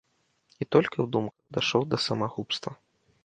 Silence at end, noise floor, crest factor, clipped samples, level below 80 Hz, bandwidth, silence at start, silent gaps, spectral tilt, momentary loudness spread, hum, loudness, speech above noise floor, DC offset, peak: 0.5 s; -68 dBFS; 22 dB; under 0.1%; -66 dBFS; 9.4 kHz; 0.6 s; none; -5.5 dB/octave; 9 LU; none; -28 LUFS; 40 dB; under 0.1%; -6 dBFS